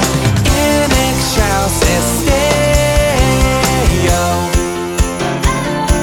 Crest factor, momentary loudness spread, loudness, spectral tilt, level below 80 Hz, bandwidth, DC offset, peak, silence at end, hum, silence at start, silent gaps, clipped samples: 12 dB; 5 LU; -13 LUFS; -4.5 dB/octave; -18 dBFS; 19 kHz; 0.1%; 0 dBFS; 0 s; none; 0 s; none; under 0.1%